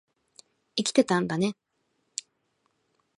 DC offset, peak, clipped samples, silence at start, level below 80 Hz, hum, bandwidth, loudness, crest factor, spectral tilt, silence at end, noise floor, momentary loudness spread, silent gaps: under 0.1%; -6 dBFS; under 0.1%; 0.75 s; -72 dBFS; none; 11.5 kHz; -28 LUFS; 24 dB; -4.5 dB/octave; 1.65 s; -75 dBFS; 15 LU; none